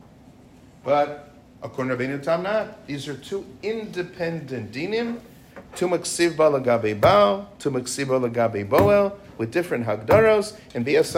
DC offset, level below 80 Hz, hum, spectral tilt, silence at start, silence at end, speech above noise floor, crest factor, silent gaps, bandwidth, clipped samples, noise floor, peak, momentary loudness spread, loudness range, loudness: under 0.1%; -52 dBFS; none; -5 dB/octave; 0.85 s; 0 s; 27 dB; 18 dB; none; 16 kHz; under 0.1%; -49 dBFS; -4 dBFS; 15 LU; 8 LU; -23 LUFS